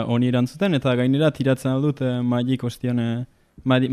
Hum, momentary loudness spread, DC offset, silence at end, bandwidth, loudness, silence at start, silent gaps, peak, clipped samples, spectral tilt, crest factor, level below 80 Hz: none; 6 LU; under 0.1%; 0 s; 13 kHz; -22 LUFS; 0 s; none; -6 dBFS; under 0.1%; -7.5 dB/octave; 16 dB; -56 dBFS